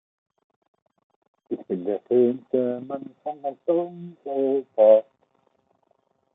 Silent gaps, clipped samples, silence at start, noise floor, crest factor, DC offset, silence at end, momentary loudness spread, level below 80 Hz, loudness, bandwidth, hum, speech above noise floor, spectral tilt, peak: none; under 0.1%; 1.5 s; -68 dBFS; 20 dB; under 0.1%; 1.35 s; 18 LU; -80 dBFS; -23 LUFS; 3.8 kHz; none; 46 dB; -11 dB/octave; -4 dBFS